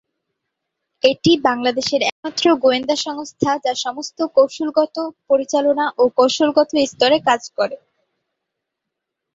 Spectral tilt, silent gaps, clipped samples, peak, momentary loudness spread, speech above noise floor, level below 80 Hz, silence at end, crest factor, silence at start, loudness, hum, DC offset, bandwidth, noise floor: -3.5 dB/octave; 2.12-2.23 s; under 0.1%; -2 dBFS; 8 LU; 63 dB; -60 dBFS; 1.6 s; 18 dB; 1.05 s; -18 LUFS; none; under 0.1%; 7.8 kHz; -80 dBFS